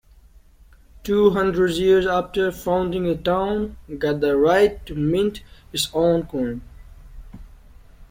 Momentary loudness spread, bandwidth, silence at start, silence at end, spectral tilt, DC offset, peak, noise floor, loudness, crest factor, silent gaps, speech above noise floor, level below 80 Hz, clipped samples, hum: 10 LU; 16.5 kHz; 1.05 s; 0.05 s; -5.5 dB/octave; under 0.1%; -4 dBFS; -50 dBFS; -21 LUFS; 18 dB; none; 30 dB; -42 dBFS; under 0.1%; none